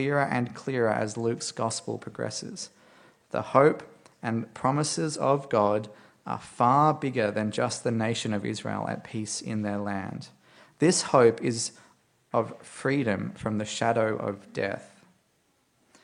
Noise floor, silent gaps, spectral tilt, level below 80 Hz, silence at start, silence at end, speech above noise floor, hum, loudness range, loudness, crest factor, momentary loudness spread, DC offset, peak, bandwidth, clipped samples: -69 dBFS; none; -5 dB/octave; -68 dBFS; 0 s; 1.15 s; 42 dB; none; 4 LU; -27 LUFS; 22 dB; 15 LU; under 0.1%; -4 dBFS; 11 kHz; under 0.1%